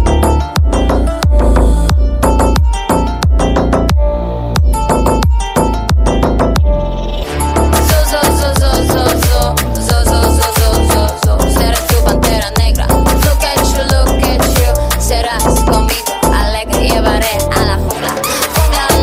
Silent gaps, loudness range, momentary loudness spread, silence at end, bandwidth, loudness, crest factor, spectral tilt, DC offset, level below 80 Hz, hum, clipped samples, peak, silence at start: none; 1 LU; 3 LU; 0 s; 16.5 kHz; -12 LUFS; 10 dB; -5 dB/octave; under 0.1%; -14 dBFS; none; under 0.1%; 0 dBFS; 0 s